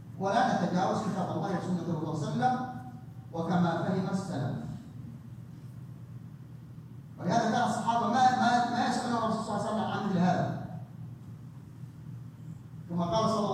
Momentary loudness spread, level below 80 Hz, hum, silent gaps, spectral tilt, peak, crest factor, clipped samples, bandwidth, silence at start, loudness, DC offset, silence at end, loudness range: 19 LU; -64 dBFS; none; none; -6 dB/octave; -12 dBFS; 20 dB; under 0.1%; 11.5 kHz; 0 s; -30 LUFS; under 0.1%; 0 s; 7 LU